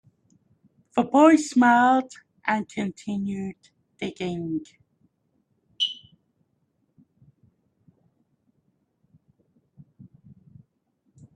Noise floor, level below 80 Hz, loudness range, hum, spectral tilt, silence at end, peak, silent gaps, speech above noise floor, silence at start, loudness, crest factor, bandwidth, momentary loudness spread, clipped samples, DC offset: -72 dBFS; -70 dBFS; 14 LU; none; -4.5 dB/octave; 5.4 s; -4 dBFS; none; 50 dB; 0.95 s; -23 LUFS; 22 dB; 10.5 kHz; 18 LU; under 0.1%; under 0.1%